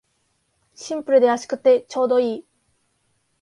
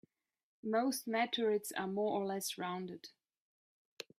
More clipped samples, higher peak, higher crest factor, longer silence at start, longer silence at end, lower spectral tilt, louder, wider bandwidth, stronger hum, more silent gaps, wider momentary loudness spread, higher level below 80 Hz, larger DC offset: neither; first, -4 dBFS vs -22 dBFS; about the same, 18 dB vs 18 dB; first, 0.8 s vs 0.65 s; about the same, 1 s vs 1.1 s; about the same, -4 dB/octave vs -3.5 dB/octave; first, -19 LUFS vs -37 LUFS; second, 11 kHz vs 15.5 kHz; neither; neither; second, 14 LU vs 18 LU; first, -72 dBFS vs -86 dBFS; neither